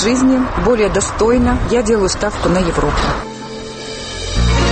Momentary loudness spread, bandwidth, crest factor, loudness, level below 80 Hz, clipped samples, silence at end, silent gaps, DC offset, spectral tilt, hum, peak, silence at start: 13 LU; 8.8 kHz; 12 dB; -15 LUFS; -24 dBFS; under 0.1%; 0 s; none; under 0.1%; -5 dB/octave; none; -2 dBFS; 0 s